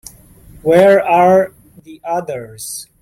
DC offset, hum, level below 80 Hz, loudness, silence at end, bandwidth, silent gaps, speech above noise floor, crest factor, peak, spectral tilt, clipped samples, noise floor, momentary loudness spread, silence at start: under 0.1%; none; -50 dBFS; -12 LUFS; 0.2 s; 16 kHz; none; 28 dB; 14 dB; -2 dBFS; -5.5 dB/octave; under 0.1%; -41 dBFS; 17 LU; 0.65 s